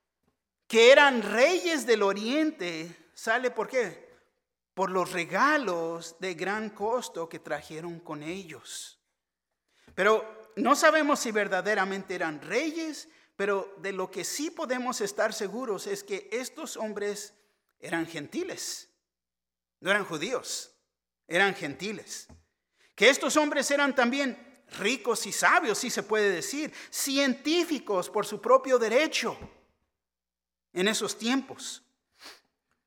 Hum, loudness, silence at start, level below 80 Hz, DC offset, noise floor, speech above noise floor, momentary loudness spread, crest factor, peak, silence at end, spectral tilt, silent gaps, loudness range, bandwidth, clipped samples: none; -27 LUFS; 0.7 s; -74 dBFS; under 0.1%; under -90 dBFS; over 62 dB; 16 LU; 24 dB; -4 dBFS; 0.5 s; -2.5 dB/octave; none; 9 LU; 18 kHz; under 0.1%